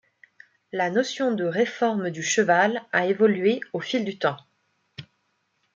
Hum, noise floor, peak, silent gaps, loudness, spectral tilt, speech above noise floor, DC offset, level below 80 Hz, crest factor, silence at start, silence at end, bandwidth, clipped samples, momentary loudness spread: none; -72 dBFS; -6 dBFS; none; -24 LUFS; -4 dB/octave; 49 dB; under 0.1%; -76 dBFS; 18 dB; 0.75 s; 0.75 s; 9.2 kHz; under 0.1%; 13 LU